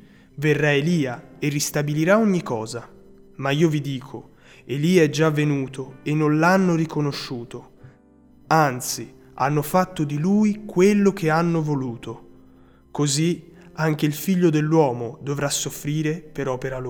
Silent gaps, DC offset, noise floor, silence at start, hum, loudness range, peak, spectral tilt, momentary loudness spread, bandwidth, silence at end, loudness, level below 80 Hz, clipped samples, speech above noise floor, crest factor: none; under 0.1%; -52 dBFS; 0.35 s; none; 3 LU; -4 dBFS; -5.5 dB/octave; 14 LU; 20 kHz; 0 s; -22 LUFS; -54 dBFS; under 0.1%; 31 dB; 18 dB